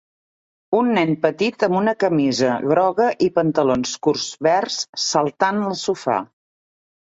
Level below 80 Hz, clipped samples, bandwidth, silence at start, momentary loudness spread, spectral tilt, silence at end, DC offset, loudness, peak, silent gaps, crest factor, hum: -60 dBFS; under 0.1%; 8 kHz; 0.7 s; 5 LU; -4.5 dB/octave; 0.9 s; under 0.1%; -19 LUFS; -2 dBFS; 4.89-4.93 s; 18 dB; none